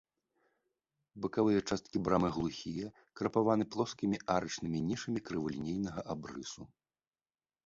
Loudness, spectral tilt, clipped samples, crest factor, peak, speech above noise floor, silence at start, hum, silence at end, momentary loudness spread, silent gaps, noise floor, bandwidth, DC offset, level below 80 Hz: -35 LUFS; -6 dB/octave; under 0.1%; 20 dB; -16 dBFS; over 55 dB; 1.15 s; none; 1 s; 12 LU; none; under -90 dBFS; 7.8 kHz; under 0.1%; -62 dBFS